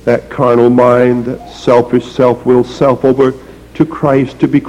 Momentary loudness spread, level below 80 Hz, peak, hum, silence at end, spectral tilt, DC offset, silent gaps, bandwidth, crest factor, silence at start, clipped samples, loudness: 9 LU; -40 dBFS; 0 dBFS; none; 0 s; -8 dB/octave; under 0.1%; none; 11 kHz; 10 dB; 0.05 s; under 0.1%; -11 LUFS